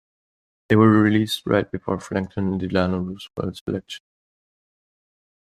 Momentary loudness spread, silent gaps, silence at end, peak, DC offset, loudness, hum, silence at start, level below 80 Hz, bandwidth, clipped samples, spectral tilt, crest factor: 15 LU; 3.61-3.66 s; 1.55 s; -2 dBFS; under 0.1%; -22 LUFS; none; 0.7 s; -56 dBFS; 13.5 kHz; under 0.1%; -7 dB/octave; 20 dB